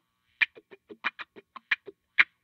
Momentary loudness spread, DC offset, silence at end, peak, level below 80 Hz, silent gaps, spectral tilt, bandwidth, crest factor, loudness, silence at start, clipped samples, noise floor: 14 LU; under 0.1%; 0.2 s; -2 dBFS; -84 dBFS; none; -1.5 dB/octave; 7.2 kHz; 30 dB; -29 LUFS; 0.4 s; under 0.1%; -52 dBFS